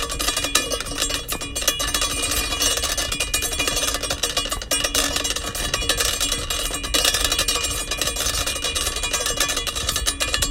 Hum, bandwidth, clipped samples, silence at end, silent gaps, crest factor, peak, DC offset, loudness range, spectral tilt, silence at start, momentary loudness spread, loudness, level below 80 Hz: none; 16.5 kHz; under 0.1%; 0 s; none; 22 dB; 0 dBFS; under 0.1%; 1 LU; -1 dB/octave; 0 s; 4 LU; -21 LUFS; -34 dBFS